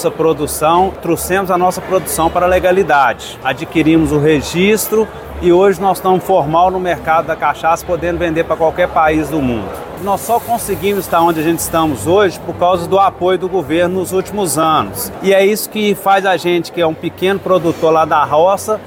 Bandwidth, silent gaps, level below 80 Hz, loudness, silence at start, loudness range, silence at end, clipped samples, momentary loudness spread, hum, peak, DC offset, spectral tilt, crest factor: 17 kHz; none; -38 dBFS; -13 LUFS; 0 s; 2 LU; 0 s; under 0.1%; 6 LU; none; 0 dBFS; under 0.1%; -5 dB/octave; 12 dB